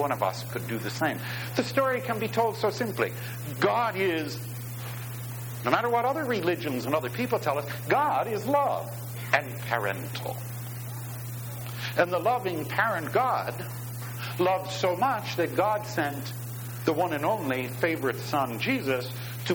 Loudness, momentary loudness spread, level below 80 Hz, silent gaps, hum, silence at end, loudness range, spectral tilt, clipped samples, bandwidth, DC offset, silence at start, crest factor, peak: -29 LUFS; 10 LU; -64 dBFS; none; none; 0 s; 2 LU; -5.5 dB/octave; under 0.1%; over 20 kHz; under 0.1%; 0 s; 24 dB; -4 dBFS